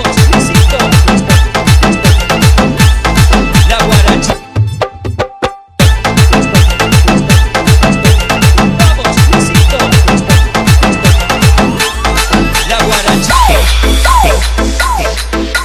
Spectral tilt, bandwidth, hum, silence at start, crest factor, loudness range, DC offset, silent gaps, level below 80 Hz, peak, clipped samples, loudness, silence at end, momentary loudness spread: -4.5 dB/octave; 16.5 kHz; none; 0 s; 8 dB; 2 LU; under 0.1%; none; -12 dBFS; 0 dBFS; 3%; -8 LUFS; 0 s; 6 LU